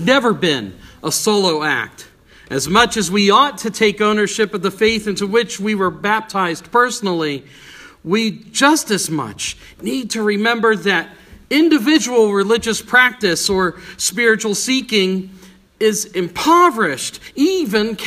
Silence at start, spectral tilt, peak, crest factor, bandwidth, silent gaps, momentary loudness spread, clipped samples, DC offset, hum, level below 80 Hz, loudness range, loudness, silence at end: 0 s; -3.5 dB/octave; 0 dBFS; 16 dB; 15.5 kHz; none; 11 LU; under 0.1%; under 0.1%; none; -50 dBFS; 4 LU; -16 LUFS; 0 s